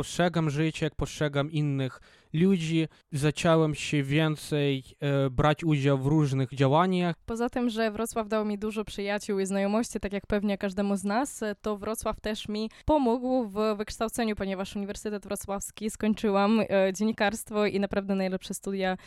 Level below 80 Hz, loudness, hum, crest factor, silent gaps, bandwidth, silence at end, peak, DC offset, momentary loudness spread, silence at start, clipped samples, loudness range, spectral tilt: -50 dBFS; -28 LUFS; none; 18 dB; none; 14.5 kHz; 0 s; -10 dBFS; under 0.1%; 9 LU; 0 s; under 0.1%; 4 LU; -6 dB/octave